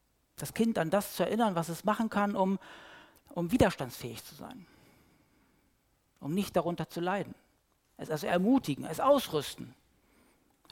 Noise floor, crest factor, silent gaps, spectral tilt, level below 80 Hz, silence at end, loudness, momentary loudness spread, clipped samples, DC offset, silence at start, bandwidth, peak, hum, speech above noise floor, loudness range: -72 dBFS; 22 dB; none; -5.5 dB/octave; -58 dBFS; 1 s; -31 LUFS; 20 LU; under 0.1%; under 0.1%; 0.4 s; 17 kHz; -10 dBFS; none; 41 dB; 6 LU